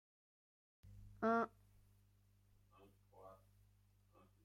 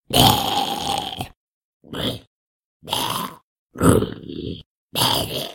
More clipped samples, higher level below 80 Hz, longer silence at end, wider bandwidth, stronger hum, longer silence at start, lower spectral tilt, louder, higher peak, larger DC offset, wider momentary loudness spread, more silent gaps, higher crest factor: neither; second, -72 dBFS vs -42 dBFS; first, 1.1 s vs 0 s; about the same, 15.5 kHz vs 17 kHz; first, 50 Hz at -70 dBFS vs none; first, 0.85 s vs 0.1 s; first, -7.5 dB/octave vs -4 dB/octave; second, -41 LUFS vs -21 LUFS; second, -26 dBFS vs 0 dBFS; neither; first, 25 LU vs 18 LU; second, none vs 1.36-1.80 s, 2.27-2.80 s, 3.43-3.69 s, 4.66-4.89 s; about the same, 22 dB vs 22 dB